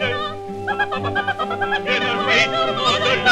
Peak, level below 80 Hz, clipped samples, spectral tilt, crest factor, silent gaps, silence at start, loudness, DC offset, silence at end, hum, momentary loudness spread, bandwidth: -2 dBFS; -48 dBFS; under 0.1%; -3.5 dB/octave; 16 dB; none; 0 s; -19 LUFS; under 0.1%; 0 s; none; 10 LU; 13 kHz